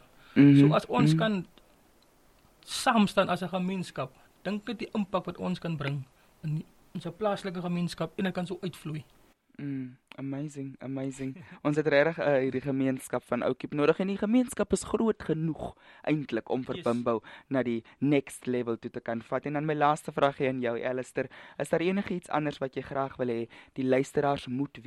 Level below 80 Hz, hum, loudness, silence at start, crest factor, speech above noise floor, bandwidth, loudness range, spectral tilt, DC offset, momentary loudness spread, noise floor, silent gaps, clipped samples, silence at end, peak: -62 dBFS; none; -29 LUFS; 0.35 s; 20 dB; 33 dB; 13 kHz; 7 LU; -6.5 dB/octave; under 0.1%; 14 LU; -62 dBFS; none; under 0.1%; 0.05 s; -10 dBFS